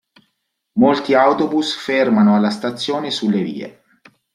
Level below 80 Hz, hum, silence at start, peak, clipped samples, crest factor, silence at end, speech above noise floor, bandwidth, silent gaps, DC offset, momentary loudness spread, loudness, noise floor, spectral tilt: -62 dBFS; none; 0.75 s; -2 dBFS; under 0.1%; 16 dB; 0.65 s; 55 dB; 11 kHz; none; under 0.1%; 12 LU; -17 LUFS; -71 dBFS; -6 dB/octave